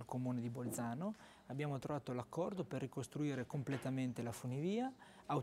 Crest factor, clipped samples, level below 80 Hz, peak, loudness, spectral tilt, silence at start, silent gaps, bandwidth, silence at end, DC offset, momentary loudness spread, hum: 16 dB; under 0.1%; -76 dBFS; -26 dBFS; -43 LUFS; -6.5 dB/octave; 0 s; none; 16 kHz; 0 s; under 0.1%; 5 LU; none